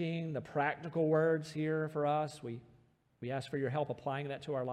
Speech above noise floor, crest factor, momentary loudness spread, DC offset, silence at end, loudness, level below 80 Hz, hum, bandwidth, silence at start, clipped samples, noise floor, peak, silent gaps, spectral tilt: 33 dB; 16 dB; 10 LU; under 0.1%; 0 s; -36 LUFS; -76 dBFS; none; 12 kHz; 0 s; under 0.1%; -68 dBFS; -20 dBFS; none; -7 dB/octave